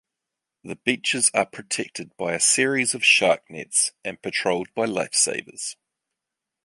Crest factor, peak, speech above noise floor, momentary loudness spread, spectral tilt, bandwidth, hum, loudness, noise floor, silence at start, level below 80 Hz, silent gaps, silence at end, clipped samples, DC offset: 20 dB; -4 dBFS; 62 dB; 15 LU; -1.5 dB/octave; 11.5 kHz; none; -21 LUFS; -85 dBFS; 0.65 s; -68 dBFS; none; 0.95 s; under 0.1%; under 0.1%